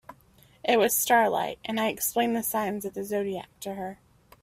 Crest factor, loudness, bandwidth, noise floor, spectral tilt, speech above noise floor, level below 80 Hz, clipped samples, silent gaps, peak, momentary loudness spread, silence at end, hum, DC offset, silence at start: 20 dB; -26 LUFS; 16 kHz; -58 dBFS; -3 dB/octave; 32 dB; -64 dBFS; under 0.1%; none; -8 dBFS; 14 LU; 0.5 s; none; under 0.1%; 0.1 s